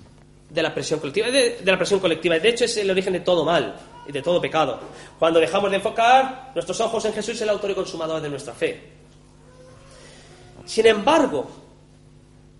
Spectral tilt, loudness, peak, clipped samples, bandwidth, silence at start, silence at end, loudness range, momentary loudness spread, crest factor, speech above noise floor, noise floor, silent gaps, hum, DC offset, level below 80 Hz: -4 dB/octave; -21 LUFS; -2 dBFS; under 0.1%; 11.5 kHz; 0 s; 1 s; 7 LU; 12 LU; 20 dB; 29 dB; -50 dBFS; none; 50 Hz at -50 dBFS; under 0.1%; -54 dBFS